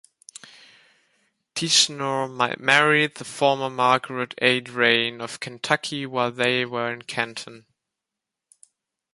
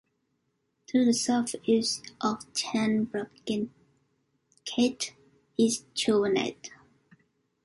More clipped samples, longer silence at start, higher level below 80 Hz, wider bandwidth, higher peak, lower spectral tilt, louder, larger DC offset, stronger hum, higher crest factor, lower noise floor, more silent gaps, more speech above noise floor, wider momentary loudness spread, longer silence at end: neither; first, 1.55 s vs 0.9 s; about the same, -70 dBFS vs -68 dBFS; about the same, 11.5 kHz vs 11.5 kHz; first, -2 dBFS vs -12 dBFS; about the same, -2.5 dB/octave vs -3.5 dB/octave; first, -22 LUFS vs -28 LUFS; neither; neither; first, 24 dB vs 18 dB; first, -86 dBFS vs -76 dBFS; neither; first, 63 dB vs 49 dB; first, 15 LU vs 11 LU; first, 1.55 s vs 0.9 s